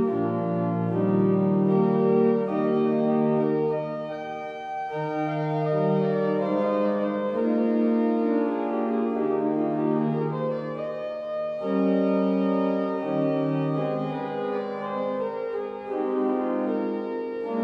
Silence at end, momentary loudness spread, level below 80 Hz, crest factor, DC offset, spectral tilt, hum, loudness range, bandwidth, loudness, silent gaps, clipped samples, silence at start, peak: 0 s; 9 LU; -70 dBFS; 14 dB; under 0.1%; -10 dB/octave; none; 5 LU; 5.8 kHz; -25 LUFS; none; under 0.1%; 0 s; -10 dBFS